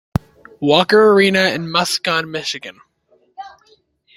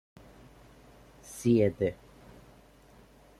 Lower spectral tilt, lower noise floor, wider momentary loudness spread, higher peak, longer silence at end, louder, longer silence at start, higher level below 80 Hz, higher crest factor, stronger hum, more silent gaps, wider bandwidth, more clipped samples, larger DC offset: second, -4 dB/octave vs -7 dB/octave; about the same, -57 dBFS vs -57 dBFS; about the same, 25 LU vs 26 LU; first, 0 dBFS vs -14 dBFS; second, 0.7 s vs 1.45 s; first, -15 LUFS vs -28 LUFS; second, 0.6 s vs 1.3 s; first, -48 dBFS vs -60 dBFS; about the same, 16 dB vs 20 dB; neither; neither; about the same, 15 kHz vs 14.5 kHz; neither; neither